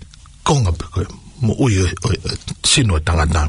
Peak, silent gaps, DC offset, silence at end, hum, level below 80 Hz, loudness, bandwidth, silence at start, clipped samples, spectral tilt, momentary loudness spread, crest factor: -2 dBFS; none; under 0.1%; 0 s; none; -28 dBFS; -17 LUFS; 11 kHz; 0 s; under 0.1%; -4.5 dB/octave; 11 LU; 16 dB